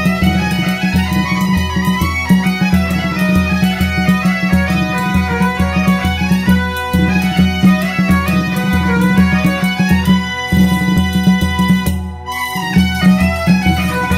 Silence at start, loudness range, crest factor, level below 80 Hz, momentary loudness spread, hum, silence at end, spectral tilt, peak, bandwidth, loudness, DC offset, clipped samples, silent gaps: 0 s; 1 LU; 12 dB; -26 dBFS; 4 LU; none; 0 s; -6 dB/octave; 0 dBFS; 16 kHz; -13 LUFS; under 0.1%; under 0.1%; none